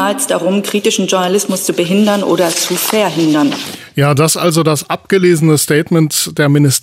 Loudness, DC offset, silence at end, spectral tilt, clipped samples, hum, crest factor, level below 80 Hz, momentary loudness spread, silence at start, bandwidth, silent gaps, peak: -12 LUFS; under 0.1%; 0.05 s; -4.5 dB/octave; under 0.1%; none; 12 dB; -58 dBFS; 4 LU; 0 s; 16 kHz; none; 0 dBFS